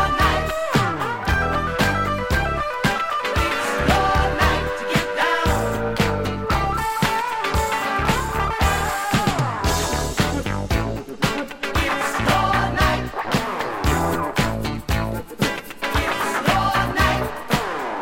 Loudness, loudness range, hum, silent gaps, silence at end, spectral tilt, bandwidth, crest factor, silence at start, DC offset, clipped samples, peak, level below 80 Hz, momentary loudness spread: -21 LUFS; 2 LU; none; none; 0 s; -4.5 dB/octave; 16.5 kHz; 18 dB; 0 s; under 0.1%; under 0.1%; -4 dBFS; -30 dBFS; 5 LU